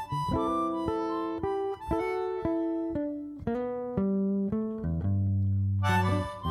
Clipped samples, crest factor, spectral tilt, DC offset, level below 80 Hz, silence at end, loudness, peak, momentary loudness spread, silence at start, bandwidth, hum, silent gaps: under 0.1%; 16 dB; -8 dB/octave; under 0.1%; -48 dBFS; 0 s; -30 LUFS; -14 dBFS; 6 LU; 0 s; 12 kHz; none; none